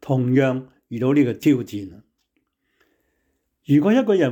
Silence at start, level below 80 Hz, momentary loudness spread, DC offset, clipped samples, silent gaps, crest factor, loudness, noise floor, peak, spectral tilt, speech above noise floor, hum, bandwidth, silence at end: 0.05 s; -66 dBFS; 16 LU; under 0.1%; under 0.1%; none; 14 dB; -19 LUFS; -72 dBFS; -6 dBFS; -8 dB/octave; 53 dB; none; 17 kHz; 0 s